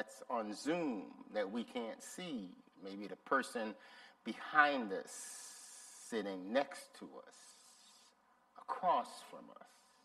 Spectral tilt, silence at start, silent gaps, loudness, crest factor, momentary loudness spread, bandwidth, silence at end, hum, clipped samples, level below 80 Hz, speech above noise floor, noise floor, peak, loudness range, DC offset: -3.5 dB/octave; 0 s; none; -40 LUFS; 28 dB; 21 LU; 15 kHz; 0.4 s; none; under 0.1%; -88 dBFS; 31 dB; -71 dBFS; -14 dBFS; 6 LU; under 0.1%